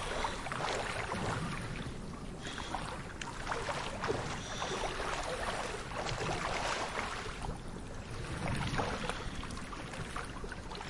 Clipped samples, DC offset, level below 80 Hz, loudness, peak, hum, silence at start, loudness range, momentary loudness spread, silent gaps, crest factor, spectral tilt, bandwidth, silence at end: under 0.1%; under 0.1%; -48 dBFS; -38 LUFS; -18 dBFS; none; 0 s; 3 LU; 8 LU; none; 20 dB; -4 dB/octave; 11.5 kHz; 0 s